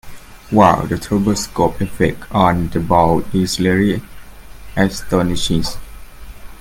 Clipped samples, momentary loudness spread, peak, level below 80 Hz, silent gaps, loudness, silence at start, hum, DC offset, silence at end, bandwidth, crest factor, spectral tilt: under 0.1%; 7 LU; 0 dBFS; -34 dBFS; none; -16 LUFS; 0.05 s; none; under 0.1%; 0 s; 17 kHz; 16 dB; -5.5 dB/octave